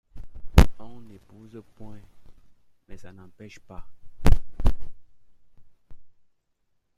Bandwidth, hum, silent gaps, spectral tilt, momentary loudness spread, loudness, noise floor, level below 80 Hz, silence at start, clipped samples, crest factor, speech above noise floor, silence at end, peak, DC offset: 14 kHz; none; none; -6.5 dB/octave; 29 LU; -25 LUFS; -71 dBFS; -28 dBFS; 0.15 s; under 0.1%; 24 dB; 32 dB; 0.9 s; 0 dBFS; under 0.1%